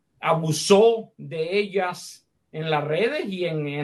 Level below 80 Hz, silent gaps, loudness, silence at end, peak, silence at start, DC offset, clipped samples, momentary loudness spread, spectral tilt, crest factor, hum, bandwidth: -68 dBFS; none; -23 LUFS; 0 s; -4 dBFS; 0.2 s; under 0.1%; under 0.1%; 17 LU; -5 dB/octave; 20 dB; none; 12.5 kHz